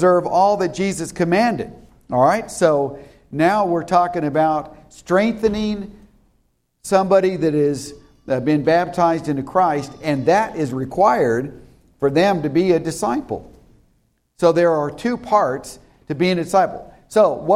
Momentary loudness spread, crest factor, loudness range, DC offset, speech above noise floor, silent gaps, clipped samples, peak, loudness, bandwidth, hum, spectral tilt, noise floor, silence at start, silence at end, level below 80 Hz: 13 LU; 16 dB; 2 LU; under 0.1%; 46 dB; none; under 0.1%; -2 dBFS; -18 LUFS; 14.5 kHz; none; -6 dB/octave; -64 dBFS; 0 s; 0 s; -50 dBFS